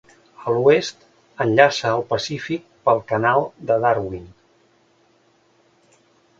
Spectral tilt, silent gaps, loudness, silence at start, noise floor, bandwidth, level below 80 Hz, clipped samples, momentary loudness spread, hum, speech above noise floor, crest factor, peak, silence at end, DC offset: -5 dB/octave; none; -20 LUFS; 0.4 s; -59 dBFS; 7.8 kHz; -56 dBFS; under 0.1%; 14 LU; none; 40 dB; 22 dB; 0 dBFS; 2.1 s; under 0.1%